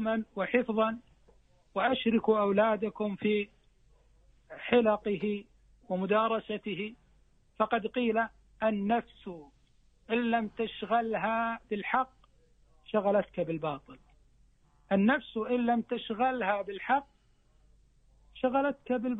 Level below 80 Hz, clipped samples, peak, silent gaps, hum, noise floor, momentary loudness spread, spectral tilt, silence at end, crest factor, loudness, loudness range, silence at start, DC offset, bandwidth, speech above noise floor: -64 dBFS; under 0.1%; -12 dBFS; none; none; -65 dBFS; 11 LU; -8.5 dB/octave; 0 s; 20 dB; -31 LUFS; 3 LU; 0 s; under 0.1%; 4 kHz; 36 dB